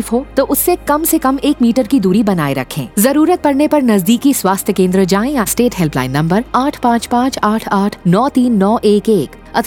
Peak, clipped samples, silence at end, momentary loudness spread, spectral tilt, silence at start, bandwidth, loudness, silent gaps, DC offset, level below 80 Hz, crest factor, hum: 0 dBFS; under 0.1%; 0 s; 4 LU; -5.5 dB/octave; 0 s; 19 kHz; -13 LUFS; none; under 0.1%; -38 dBFS; 12 dB; none